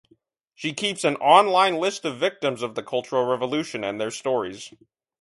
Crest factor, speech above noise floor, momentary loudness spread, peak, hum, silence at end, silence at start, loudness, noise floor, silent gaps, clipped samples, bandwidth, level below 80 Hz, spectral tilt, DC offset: 22 dB; 40 dB; 14 LU; -2 dBFS; none; 0.5 s; 0.6 s; -23 LUFS; -63 dBFS; none; under 0.1%; 11.5 kHz; -70 dBFS; -3.5 dB/octave; under 0.1%